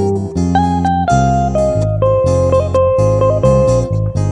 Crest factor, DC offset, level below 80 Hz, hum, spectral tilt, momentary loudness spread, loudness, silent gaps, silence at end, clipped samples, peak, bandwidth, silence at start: 12 dB; under 0.1%; -26 dBFS; none; -8 dB/octave; 4 LU; -13 LUFS; none; 0 s; under 0.1%; 0 dBFS; 10 kHz; 0 s